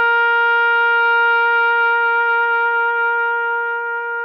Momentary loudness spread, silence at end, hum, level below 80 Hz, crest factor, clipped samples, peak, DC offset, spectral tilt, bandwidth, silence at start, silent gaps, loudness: 6 LU; 0 s; none; -76 dBFS; 8 dB; under 0.1%; -8 dBFS; under 0.1%; -0.5 dB/octave; 5.4 kHz; 0 s; none; -15 LUFS